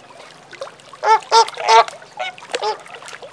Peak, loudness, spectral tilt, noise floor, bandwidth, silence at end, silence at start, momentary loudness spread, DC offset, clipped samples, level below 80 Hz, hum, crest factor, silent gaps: 0 dBFS; -16 LUFS; 0 dB/octave; -41 dBFS; 10.5 kHz; 0.05 s; 0.55 s; 21 LU; under 0.1%; under 0.1%; -72 dBFS; none; 18 dB; none